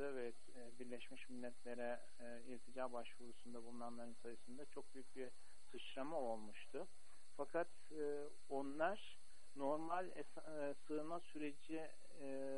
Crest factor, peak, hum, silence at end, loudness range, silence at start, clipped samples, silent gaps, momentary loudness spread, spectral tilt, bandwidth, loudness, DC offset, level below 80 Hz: 22 dB; -30 dBFS; none; 0 s; 7 LU; 0 s; under 0.1%; none; 13 LU; -5 dB/octave; 11.5 kHz; -50 LUFS; 0.5%; -82 dBFS